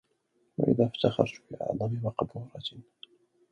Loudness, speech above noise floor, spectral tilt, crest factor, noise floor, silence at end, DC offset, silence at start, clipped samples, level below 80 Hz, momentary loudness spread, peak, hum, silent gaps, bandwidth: -30 LUFS; 43 dB; -8 dB/octave; 24 dB; -73 dBFS; 0.7 s; under 0.1%; 0.6 s; under 0.1%; -62 dBFS; 14 LU; -8 dBFS; none; none; 8.4 kHz